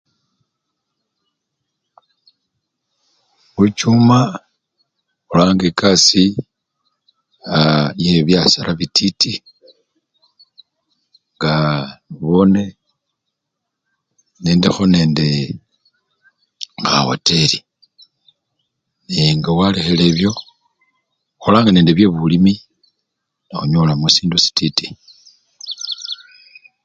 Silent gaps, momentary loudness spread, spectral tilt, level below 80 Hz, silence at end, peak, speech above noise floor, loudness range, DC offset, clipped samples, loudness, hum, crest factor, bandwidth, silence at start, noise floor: none; 17 LU; -5 dB/octave; -44 dBFS; 0.7 s; 0 dBFS; 64 dB; 5 LU; under 0.1%; under 0.1%; -14 LUFS; none; 18 dB; 9.2 kHz; 3.55 s; -78 dBFS